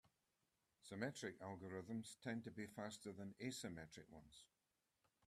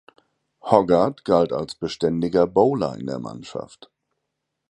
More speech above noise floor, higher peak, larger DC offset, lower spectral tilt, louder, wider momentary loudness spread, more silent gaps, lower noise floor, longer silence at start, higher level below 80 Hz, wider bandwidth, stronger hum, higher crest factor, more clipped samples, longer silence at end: second, 37 dB vs 58 dB; second, -30 dBFS vs 0 dBFS; neither; second, -4.5 dB/octave vs -7 dB/octave; second, -52 LUFS vs -21 LUFS; second, 14 LU vs 17 LU; neither; first, -89 dBFS vs -79 dBFS; second, 0.05 s vs 0.65 s; second, -82 dBFS vs -54 dBFS; first, 13.5 kHz vs 11.5 kHz; neither; about the same, 24 dB vs 22 dB; neither; second, 0.8 s vs 1.1 s